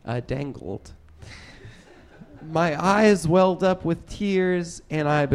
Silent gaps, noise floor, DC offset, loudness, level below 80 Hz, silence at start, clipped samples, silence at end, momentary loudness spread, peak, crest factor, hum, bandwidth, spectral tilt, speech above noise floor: none; -49 dBFS; under 0.1%; -22 LUFS; -48 dBFS; 0.05 s; under 0.1%; 0 s; 20 LU; -4 dBFS; 18 dB; none; 13 kHz; -6.5 dB/octave; 26 dB